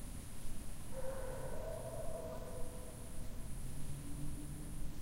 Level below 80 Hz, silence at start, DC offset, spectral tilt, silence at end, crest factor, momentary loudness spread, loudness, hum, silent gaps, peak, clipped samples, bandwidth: -46 dBFS; 0 s; under 0.1%; -5.5 dB/octave; 0 s; 12 dB; 5 LU; -48 LUFS; none; none; -28 dBFS; under 0.1%; 16 kHz